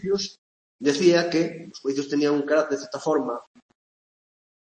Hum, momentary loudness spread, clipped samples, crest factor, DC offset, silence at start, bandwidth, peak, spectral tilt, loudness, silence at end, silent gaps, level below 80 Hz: none; 12 LU; under 0.1%; 18 dB; under 0.1%; 0 s; 8.8 kHz; -6 dBFS; -4.5 dB/octave; -24 LUFS; 1.4 s; 0.38-0.79 s; -68 dBFS